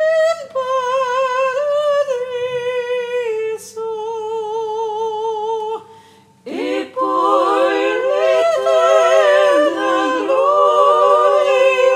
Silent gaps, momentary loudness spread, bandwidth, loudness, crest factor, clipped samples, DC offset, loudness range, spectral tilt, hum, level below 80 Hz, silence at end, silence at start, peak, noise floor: none; 11 LU; 14 kHz; -16 LUFS; 14 dB; under 0.1%; under 0.1%; 10 LU; -2.5 dB/octave; none; -72 dBFS; 0 s; 0 s; -2 dBFS; -46 dBFS